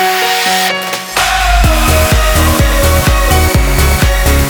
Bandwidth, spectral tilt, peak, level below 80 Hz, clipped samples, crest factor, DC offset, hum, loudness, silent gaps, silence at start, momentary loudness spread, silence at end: over 20 kHz; -4 dB/octave; 0 dBFS; -14 dBFS; under 0.1%; 10 dB; under 0.1%; none; -10 LUFS; none; 0 s; 2 LU; 0 s